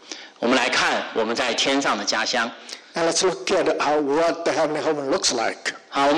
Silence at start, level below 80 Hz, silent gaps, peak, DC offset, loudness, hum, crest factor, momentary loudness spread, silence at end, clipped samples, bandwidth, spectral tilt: 0.05 s; -60 dBFS; none; -10 dBFS; under 0.1%; -21 LUFS; none; 12 dB; 7 LU; 0 s; under 0.1%; 12 kHz; -2 dB/octave